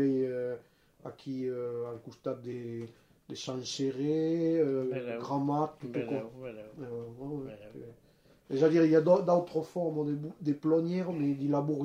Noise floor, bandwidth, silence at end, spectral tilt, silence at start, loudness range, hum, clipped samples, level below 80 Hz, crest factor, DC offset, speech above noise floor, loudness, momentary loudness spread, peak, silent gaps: -56 dBFS; 9.8 kHz; 0 s; -7 dB/octave; 0 s; 9 LU; none; under 0.1%; -72 dBFS; 18 dB; under 0.1%; 25 dB; -32 LUFS; 19 LU; -12 dBFS; none